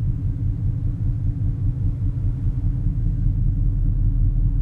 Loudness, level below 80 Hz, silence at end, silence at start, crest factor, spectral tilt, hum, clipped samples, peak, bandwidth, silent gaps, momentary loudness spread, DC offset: -24 LUFS; -22 dBFS; 0 s; 0 s; 12 dB; -11.5 dB/octave; none; under 0.1%; -8 dBFS; 1.6 kHz; none; 3 LU; under 0.1%